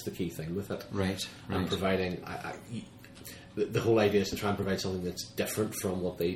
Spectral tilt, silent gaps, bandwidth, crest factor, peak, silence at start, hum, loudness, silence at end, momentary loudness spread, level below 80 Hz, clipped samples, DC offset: -5 dB/octave; none; 16.5 kHz; 20 dB; -12 dBFS; 0 s; none; -32 LUFS; 0 s; 15 LU; -58 dBFS; under 0.1%; under 0.1%